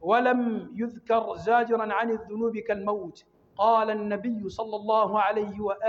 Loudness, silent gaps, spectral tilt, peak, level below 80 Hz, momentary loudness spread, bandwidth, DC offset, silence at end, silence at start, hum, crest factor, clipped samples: -26 LUFS; none; -6.5 dB/octave; -10 dBFS; -64 dBFS; 10 LU; 7.4 kHz; under 0.1%; 0 s; 0 s; none; 16 dB; under 0.1%